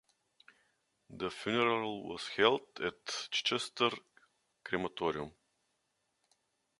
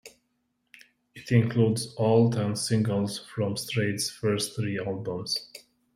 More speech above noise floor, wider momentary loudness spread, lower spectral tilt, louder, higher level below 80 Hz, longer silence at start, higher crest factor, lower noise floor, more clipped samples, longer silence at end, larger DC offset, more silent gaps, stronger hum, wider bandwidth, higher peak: about the same, 46 dB vs 49 dB; first, 12 LU vs 9 LU; second, -3.5 dB/octave vs -5.5 dB/octave; second, -34 LUFS vs -27 LUFS; second, -72 dBFS vs -64 dBFS; first, 1.1 s vs 0.05 s; first, 26 dB vs 20 dB; first, -81 dBFS vs -75 dBFS; neither; first, 1.5 s vs 0.4 s; neither; neither; neither; second, 11.5 kHz vs 15 kHz; second, -12 dBFS vs -8 dBFS